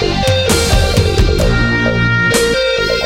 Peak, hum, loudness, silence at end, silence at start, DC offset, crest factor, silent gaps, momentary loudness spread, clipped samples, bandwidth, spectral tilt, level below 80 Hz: 0 dBFS; none; -12 LUFS; 0 s; 0 s; under 0.1%; 12 dB; none; 2 LU; under 0.1%; 17 kHz; -4.5 dB/octave; -20 dBFS